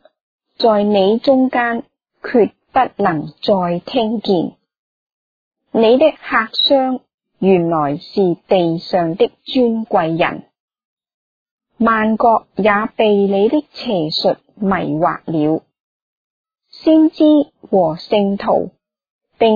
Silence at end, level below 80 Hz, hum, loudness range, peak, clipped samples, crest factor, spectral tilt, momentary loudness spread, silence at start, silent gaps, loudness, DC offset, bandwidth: 0 s; -54 dBFS; none; 3 LU; 0 dBFS; under 0.1%; 16 dB; -8 dB/octave; 7 LU; 0.6 s; 4.79-5.51 s, 7.14-7.18 s, 10.60-10.68 s, 10.85-10.97 s, 11.14-11.58 s, 15.80-16.44 s, 19.10-19.19 s; -15 LUFS; under 0.1%; 5 kHz